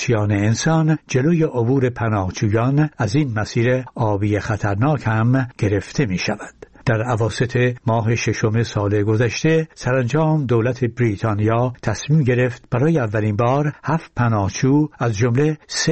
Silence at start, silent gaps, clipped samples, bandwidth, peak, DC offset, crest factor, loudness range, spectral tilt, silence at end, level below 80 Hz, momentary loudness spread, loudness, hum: 0 s; none; under 0.1%; 8.6 kHz; -6 dBFS; 0.3%; 14 dB; 2 LU; -6.5 dB/octave; 0 s; -46 dBFS; 4 LU; -19 LUFS; none